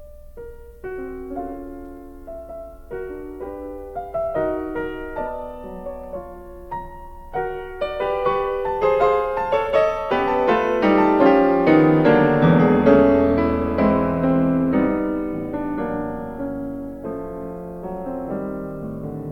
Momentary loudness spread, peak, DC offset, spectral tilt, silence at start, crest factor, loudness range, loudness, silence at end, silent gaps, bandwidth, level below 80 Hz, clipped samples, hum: 20 LU; -2 dBFS; under 0.1%; -9 dB/octave; 0 s; 18 dB; 15 LU; -20 LUFS; 0 s; none; 15.5 kHz; -40 dBFS; under 0.1%; none